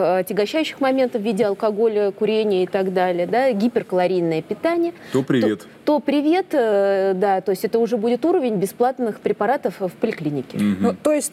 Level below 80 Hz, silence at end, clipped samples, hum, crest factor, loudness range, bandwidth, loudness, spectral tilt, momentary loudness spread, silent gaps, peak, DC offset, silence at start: -68 dBFS; 0.05 s; under 0.1%; none; 14 dB; 2 LU; 15.5 kHz; -20 LUFS; -6 dB/octave; 4 LU; none; -6 dBFS; under 0.1%; 0 s